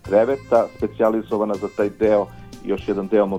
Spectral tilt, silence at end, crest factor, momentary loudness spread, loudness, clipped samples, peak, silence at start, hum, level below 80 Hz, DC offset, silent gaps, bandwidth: -7.5 dB/octave; 0 s; 16 dB; 8 LU; -21 LUFS; under 0.1%; -4 dBFS; 0.05 s; none; -48 dBFS; under 0.1%; none; 13.5 kHz